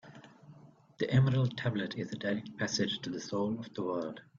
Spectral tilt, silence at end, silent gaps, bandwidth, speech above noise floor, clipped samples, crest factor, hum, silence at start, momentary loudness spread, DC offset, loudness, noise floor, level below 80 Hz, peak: -6 dB/octave; 0.15 s; none; 7.4 kHz; 25 dB; under 0.1%; 18 dB; none; 0.05 s; 10 LU; under 0.1%; -33 LUFS; -58 dBFS; -66 dBFS; -16 dBFS